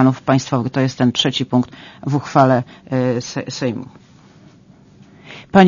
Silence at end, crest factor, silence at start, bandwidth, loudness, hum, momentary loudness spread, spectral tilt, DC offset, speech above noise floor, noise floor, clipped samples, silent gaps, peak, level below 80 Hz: 0 s; 18 dB; 0 s; 7.4 kHz; -18 LUFS; none; 15 LU; -6 dB/octave; under 0.1%; 29 dB; -47 dBFS; under 0.1%; none; 0 dBFS; -54 dBFS